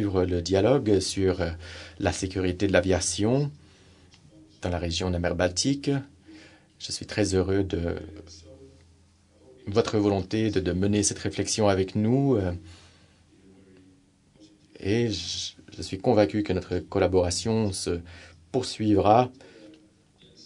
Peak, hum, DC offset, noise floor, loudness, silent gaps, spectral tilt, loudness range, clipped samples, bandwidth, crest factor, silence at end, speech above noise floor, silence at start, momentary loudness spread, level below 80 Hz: -4 dBFS; none; under 0.1%; -59 dBFS; -26 LUFS; none; -5 dB/octave; 6 LU; under 0.1%; 11 kHz; 24 dB; 0.7 s; 34 dB; 0 s; 13 LU; -54 dBFS